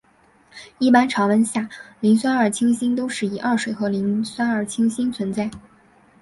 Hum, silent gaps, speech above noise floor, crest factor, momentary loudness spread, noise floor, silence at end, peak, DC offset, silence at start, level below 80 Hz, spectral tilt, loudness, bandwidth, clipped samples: none; none; 36 dB; 18 dB; 8 LU; -56 dBFS; 0.6 s; -2 dBFS; under 0.1%; 0.55 s; -60 dBFS; -5 dB/octave; -21 LUFS; 11.5 kHz; under 0.1%